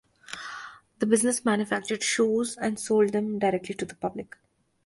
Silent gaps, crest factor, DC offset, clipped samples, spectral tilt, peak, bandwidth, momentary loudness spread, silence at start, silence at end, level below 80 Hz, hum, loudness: none; 20 dB; under 0.1%; under 0.1%; -4 dB/octave; -8 dBFS; 11.5 kHz; 17 LU; 0.3 s; 0.6 s; -66 dBFS; none; -26 LUFS